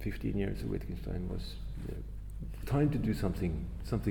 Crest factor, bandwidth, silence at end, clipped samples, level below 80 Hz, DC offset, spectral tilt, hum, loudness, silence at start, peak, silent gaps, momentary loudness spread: 16 dB; 18 kHz; 0 s; under 0.1%; -40 dBFS; under 0.1%; -8 dB/octave; none; -36 LUFS; 0 s; -18 dBFS; none; 13 LU